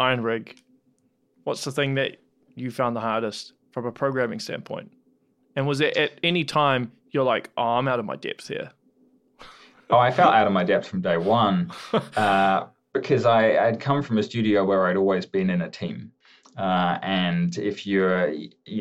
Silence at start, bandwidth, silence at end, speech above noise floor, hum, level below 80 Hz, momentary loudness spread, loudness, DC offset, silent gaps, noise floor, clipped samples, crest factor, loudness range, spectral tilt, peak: 0 s; 12.5 kHz; 0 s; 43 dB; none; -70 dBFS; 14 LU; -23 LUFS; under 0.1%; none; -66 dBFS; under 0.1%; 20 dB; 7 LU; -6 dB/octave; -4 dBFS